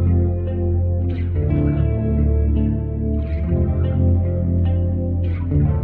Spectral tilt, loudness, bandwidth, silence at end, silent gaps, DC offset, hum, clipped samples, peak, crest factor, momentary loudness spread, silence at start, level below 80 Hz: -13 dB/octave; -20 LUFS; 3.3 kHz; 0 s; none; under 0.1%; none; under 0.1%; -6 dBFS; 12 dB; 4 LU; 0 s; -24 dBFS